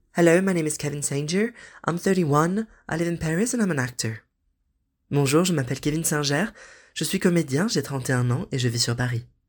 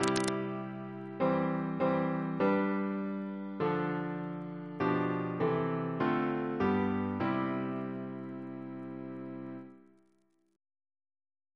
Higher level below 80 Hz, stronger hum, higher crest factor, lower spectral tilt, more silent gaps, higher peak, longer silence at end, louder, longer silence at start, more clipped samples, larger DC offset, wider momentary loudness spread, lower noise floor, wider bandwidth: first, -54 dBFS vs -70 dBFS; neither; about the same, 20 dB vs 24 dB; second, -5 dB/octave vs -6.5 dB/octave; neither; first, -4 dBFS vs -10 dBFS; second, 0.25 s vs 1.75 s; first, -24 LUFS vs -34 LUFS; first, 0.15 s vs 0 s; neither; neither; second, 9 LU vs 12 LU; about the same, -73 dBFS vs -73 dBFS; first, 19 kHz vs 11 kHz